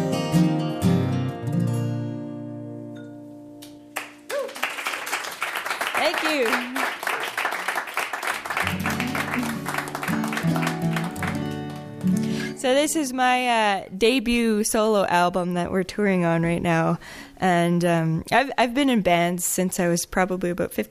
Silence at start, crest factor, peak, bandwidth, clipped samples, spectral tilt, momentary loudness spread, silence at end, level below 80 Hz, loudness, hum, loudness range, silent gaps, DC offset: 0 s; 18 dB; -6 dBFS; 15.5 kHz; under 0.1%; -5 dB/octave; 13 LU; 0.05 s; -52 dBFS; -23 LUFS; none; 8 LU; none; under 0.1%